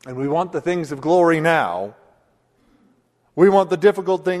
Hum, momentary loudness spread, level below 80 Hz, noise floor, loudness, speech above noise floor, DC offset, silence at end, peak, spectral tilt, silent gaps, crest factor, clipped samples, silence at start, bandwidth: none; 10 LU; -62 dBFS; -61 dBFS; -18 LUFS; 43 dB; under 0.1%; 0 s; -2 dBFS; -6.5 dB/octave; none; 18 dB; under 0.1%; 0.05 s; 12.5 kHz